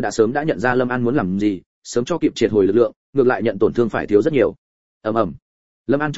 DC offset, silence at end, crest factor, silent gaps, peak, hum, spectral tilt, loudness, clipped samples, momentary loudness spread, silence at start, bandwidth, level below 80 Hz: 0.9%; 0 s; 18 dB; 1.66-1.82 s, 2.96-3.13 s, 4.58-5.01 s, 5.42-5.85 s; -2 dBFS; none; -6.5 dB/octave; -19 LUFS; under 0.1%; 8 LU; 0 s; 8 kHz; -50 dBFS